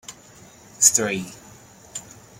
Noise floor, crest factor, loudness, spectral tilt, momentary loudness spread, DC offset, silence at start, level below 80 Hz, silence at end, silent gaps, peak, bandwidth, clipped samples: -48 dBFS; 26 dB; -18 LUFS; -1.5 dB/octave; 22 LU; under 0.1%; 0.1 s; -62 dBFS; 0.4 s; none; 0 dBFS; 16.5 kHz; under 0.1%